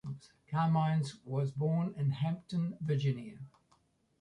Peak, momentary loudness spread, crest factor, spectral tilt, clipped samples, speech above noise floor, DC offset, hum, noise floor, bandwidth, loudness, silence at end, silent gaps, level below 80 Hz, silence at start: -20 dBFS; 17 LU; 14 dB; -8 dB/octave; under 0.1%; 39 dB; under 0.1%; none; -72 dBFS; 10.5 kHz; -34 LUFS; 0.75 s; none; -70 dBFS; 0.05 s